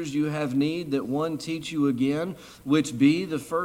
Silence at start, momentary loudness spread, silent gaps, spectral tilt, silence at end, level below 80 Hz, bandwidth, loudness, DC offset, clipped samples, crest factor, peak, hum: 0 s; 8 LU; none; -6 dB/octave; 0 s; -62 dBFS; 15.5 kHz; -26 LUFS; under 0.1%; under 0.1%; 18 dB; -8 dBFS; none